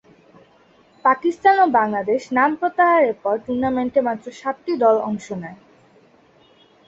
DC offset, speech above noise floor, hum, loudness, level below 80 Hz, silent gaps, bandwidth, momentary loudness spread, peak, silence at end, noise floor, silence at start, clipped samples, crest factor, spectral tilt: under 0.1%; 35 dB; none; -19 LUFS; -60 dBFS; none; 8 kHz; 12 LU; -4 dBFS; 1.35 s; -54 dBFS; 1.05 s; under 0.1%; 18 dB; -6 dB/octave